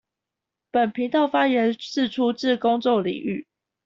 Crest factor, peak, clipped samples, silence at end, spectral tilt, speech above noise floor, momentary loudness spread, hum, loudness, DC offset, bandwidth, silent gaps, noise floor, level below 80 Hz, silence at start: 16 dB; -8 dBFS; under 0.1%; 0.45 s; -5.5 dB/octave; 64 dB; 7 LU; none; -23 LUFS; under 0.1%; 7.4 kHz; none; -86 dBFS; -66 dBFS; 0.75 s